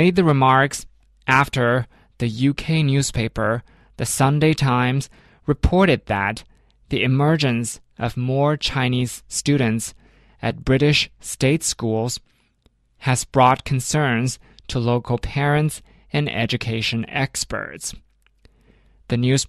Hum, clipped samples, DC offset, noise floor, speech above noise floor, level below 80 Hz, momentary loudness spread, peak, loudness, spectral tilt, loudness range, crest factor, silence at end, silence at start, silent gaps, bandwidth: none; under 0.1%; under 0.1%; -61 dBFS; 42 dB; -38 dBFS; 11 LU; -2 dBFS; -20 LUFS; -5 dB/octave; 3 LU; 18 dB; 0 s; 0 s; none; 13.5 kHz